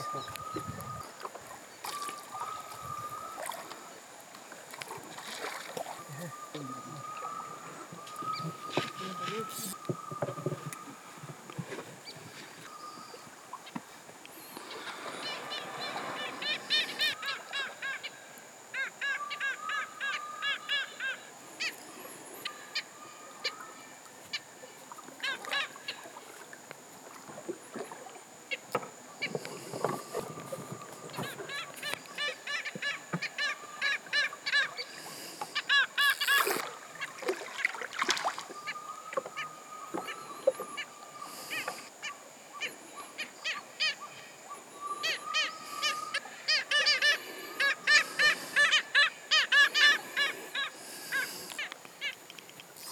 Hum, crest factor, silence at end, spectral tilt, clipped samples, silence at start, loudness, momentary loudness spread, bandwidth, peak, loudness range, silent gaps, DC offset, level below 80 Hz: none; 26 dB; 0 s; -1.5 dB/octave; under 0.1%; 0 s; -32 LUFS; 21 LU; 19 kHz; -8 dBFS; 16 LU; none; under 0.1%; -80 dBFS